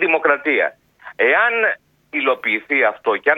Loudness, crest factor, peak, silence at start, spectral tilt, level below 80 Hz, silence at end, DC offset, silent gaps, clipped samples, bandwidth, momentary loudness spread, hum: -17 LUFS; 18 dB; 0 dBFS; 0 s; -5.5 dB/octave; -70 dBFS; 0 s; under 0.1%; none; under 0.1%; 4.8 kHz; 7 LU; none